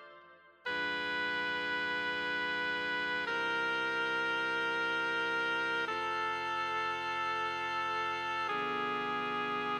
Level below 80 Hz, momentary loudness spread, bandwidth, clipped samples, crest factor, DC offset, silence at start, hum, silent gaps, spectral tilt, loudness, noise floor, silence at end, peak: -72 dBFS; 2 LU; 16 kHz; under 0.1%; 12 dB; under 0.1%; 0 s; none; none; -3 dB/octave; -33 LUFS; -58 dBFS; 0 s; -22 dBFS